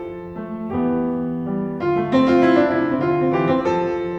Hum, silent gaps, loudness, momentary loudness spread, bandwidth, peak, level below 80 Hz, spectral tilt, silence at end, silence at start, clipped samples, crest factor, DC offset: none; none; -19 LUFS; 12 LU; 7.2 kHz; -4 dBFS; -50 dBFS; -8 dB/octave; 0 s; 0 s; under 0.1%; 16 dB; under 0.1%